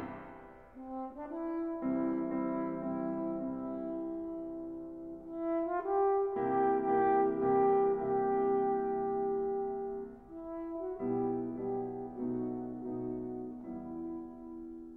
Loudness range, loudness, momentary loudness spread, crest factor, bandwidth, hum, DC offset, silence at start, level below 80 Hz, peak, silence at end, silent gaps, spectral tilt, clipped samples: 8 LU; -35 LUFS; 15 LU; 16 dB; 3.3 kHz; none; under 0.1%; 0 s; -64 dBFS; -18 dBFS; 0 s; none; -10.5 dB/octave; under 0.1%